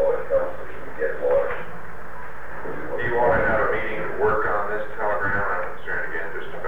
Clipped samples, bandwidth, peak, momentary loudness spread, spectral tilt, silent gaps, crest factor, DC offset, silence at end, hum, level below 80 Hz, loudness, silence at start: under 0.1%; 14 kHz; -10 dBFS; 16 LU; -7 dB/octave; none; 16 dB; 6%; 0 s; none; -44 dBFS; -24 LUFS; 0 s